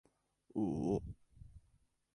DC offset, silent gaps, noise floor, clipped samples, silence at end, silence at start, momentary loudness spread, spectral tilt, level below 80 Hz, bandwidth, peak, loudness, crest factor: under 0.1%; none; -74 dBFS; under 0.1%; 0.6 s; 0.55 s; 24 LU; -9.5 dB/octave; -60 dBFS; 11 kHz; -24 dBFS; -39 LUFS; 20 dB